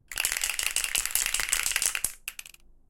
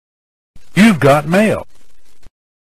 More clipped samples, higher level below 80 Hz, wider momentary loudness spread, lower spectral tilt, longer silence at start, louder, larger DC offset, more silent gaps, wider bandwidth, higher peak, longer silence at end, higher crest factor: neither; second, -50 dBFS vs -42 dBFS; about the same, 12 LU vs 10 LU; second, 2.5 dB/octave vs -6 dB/octave; second, 0.1 s vs 0.55 s; second, -26 LUFS vs -12 LUFS; neither; neither; first, 17 kHz vs 15 kHz; second, -4 dBFS vs 0 dBFS; about the same, 0.4 s vs 0.35 s; first, 26 dB vs 16 dB